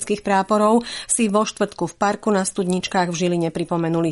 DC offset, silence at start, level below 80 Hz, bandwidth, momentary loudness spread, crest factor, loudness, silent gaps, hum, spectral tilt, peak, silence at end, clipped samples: under 0.1%; 0 s; -56 dBFS; 11.5 kHz; 6 LU; 14 dB; -20 LUFS; none; none; -4.5 dB/octave; -6 dBFS; 0 s; under 0.1%